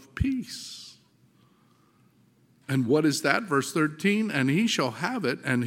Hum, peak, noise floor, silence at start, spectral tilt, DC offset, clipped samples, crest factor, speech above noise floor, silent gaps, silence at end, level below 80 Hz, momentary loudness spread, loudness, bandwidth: none; -4 dBFS; -62 dBFS; 0.15 s; -5 dB/octave; under 0.1%; under 0.1%; 24 dB; 37 dB; none; 0 s; -50 dBFS; 15 LU; -26 LUFS; 16.5 kHz